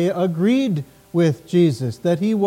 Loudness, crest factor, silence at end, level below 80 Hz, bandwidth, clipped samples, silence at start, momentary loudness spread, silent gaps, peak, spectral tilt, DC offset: -20 LUFS; 12 dB; 0 s; -60 dBFS; 15.5 kHz; under 0.1%; 0 s; 6 LU; none; -6 dBFS; -7.5 dB/octave; under 0.1%